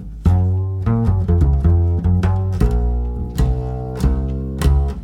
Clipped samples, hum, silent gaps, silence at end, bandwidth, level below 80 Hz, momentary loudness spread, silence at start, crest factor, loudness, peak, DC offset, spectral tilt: under 0.1%; none; none; 0 s; 11.5 kHz; -20 dBFS; 7 LU; 0 s; 14 dB; -18 LUFS; -2 dBFS; under 0.1%; -8.5 dB/octave